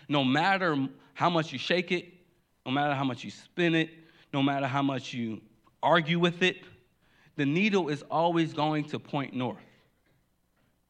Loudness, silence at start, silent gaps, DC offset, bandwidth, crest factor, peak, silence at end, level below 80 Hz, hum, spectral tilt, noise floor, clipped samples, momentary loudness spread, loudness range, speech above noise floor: -28 LUFS; 0.1 s; none; under 0.1%; 9.8 kHz; 20 dB; -10 dBFS; 1.3 s; -76 dBFS; none; -6 dB/octave; -71 dBFS; under 0.1%; 11 LU; 3 LU; 43 dB